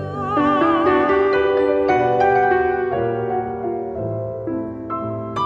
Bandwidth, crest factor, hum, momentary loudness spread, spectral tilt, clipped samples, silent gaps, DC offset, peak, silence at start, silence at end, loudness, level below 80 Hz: 6.6 kHz; 14 dB; none; 10 LU; -8 dB/octave; under 0.1%; none; under 0.1%; -4 dBFS; 0 s; 0 s; -19 LUFS; -46 dBFS